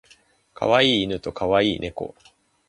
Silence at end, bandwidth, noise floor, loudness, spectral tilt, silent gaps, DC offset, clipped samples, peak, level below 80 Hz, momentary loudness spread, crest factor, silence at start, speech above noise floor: 0.6 s; 11 kHz; -57 dBFS; -21 LUFS; -5 dB/octave; none; under 0.1%; under 0.1%; -4 dBFS; -50 dBFS; 15 LU; 20 dB; 0.6 s; 35 dB